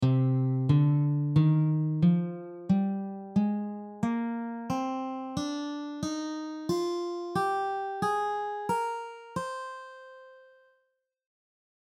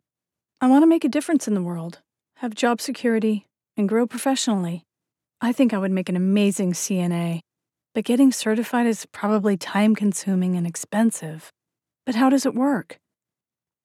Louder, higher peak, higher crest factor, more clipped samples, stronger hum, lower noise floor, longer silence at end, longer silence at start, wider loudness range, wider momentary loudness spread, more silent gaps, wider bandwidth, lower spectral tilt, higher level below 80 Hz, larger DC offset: second, -30 LUFS vs -22 LUFS; second, -12 dBFS vs -6 dBFS; about the same, 18 dB vs 16 dB; neither; neither; second, -77 dBFS vs under -90 dBFS; first, 1.55 s vs 0.9 s; second, 0 s vs 0.6 s; first, 8 LU vs 3 LU; about the same, 12 LU vs 12 LU; neither; second, 11.5 kHz vs 15.5 kHz; first, -7.5 dB/octave vs -5.5 dB/octave; first, -64 dBFS vs -78 dBFS; neither